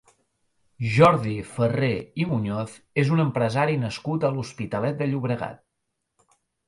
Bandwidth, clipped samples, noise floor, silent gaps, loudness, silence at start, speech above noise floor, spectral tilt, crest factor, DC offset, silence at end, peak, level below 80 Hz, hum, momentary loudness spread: 11.5 kHz; under 0.1%; -79 dBFS; none; -24 LUFS; 0.8 s; 55 dB; -7.5 dB/octave; 22 dB; under 0.1%; 1.15 s; -4 dBFS; -56 dBFS; none; 12 LU